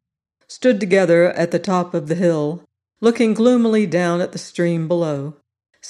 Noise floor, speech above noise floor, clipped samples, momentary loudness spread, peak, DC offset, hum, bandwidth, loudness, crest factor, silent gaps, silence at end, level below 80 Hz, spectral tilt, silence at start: -64 dBFS; 47 dB; under 0.1%; 9 LU; -2 dBFS; under 0.1%; none; 11.5 kHz; -18 LUFS; 16 dB; none; 0 s; -66 dBFS; -6.5 dB/octave; 0.5 s